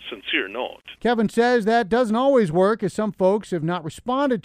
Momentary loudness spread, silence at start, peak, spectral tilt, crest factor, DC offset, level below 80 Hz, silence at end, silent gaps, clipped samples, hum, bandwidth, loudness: 9 LU; 0 s; -6 dBFS; -6 dB/octave; 14 dB; under 0.1%; -56 dBFS; 0.05 s; none; under 0.1%; none; 14 kHz; -21 LUFS